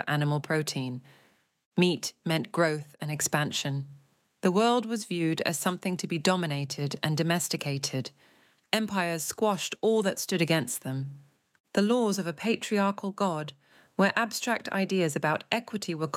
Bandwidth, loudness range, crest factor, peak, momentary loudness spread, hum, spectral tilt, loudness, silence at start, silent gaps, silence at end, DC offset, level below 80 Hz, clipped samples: 17 kHz; 2 LU; 22 dB; -6 dBFS; 9 LU; none; -4.5 dB/octave; -29 LUFS; 0 s; 1.65-1.72 s, 11.60-11.64 s; 0 s; under 0.1%; -76 dBFS; under 0.1%